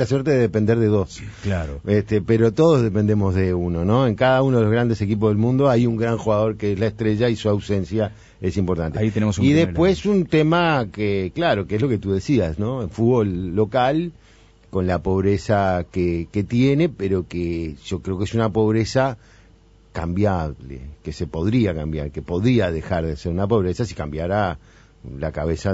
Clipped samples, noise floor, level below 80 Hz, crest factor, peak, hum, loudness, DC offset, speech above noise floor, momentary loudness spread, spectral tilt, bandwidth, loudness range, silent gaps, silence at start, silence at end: under 0.1%; -51 dBFS; -40 dBFS; 16 dB; -4 dBFS; none; -21 LUFS; under 0.1%; 31 dB; 10 LU; -7.5 dB/octave; 8 kHz; 5 LU; none; 0 s; 0 s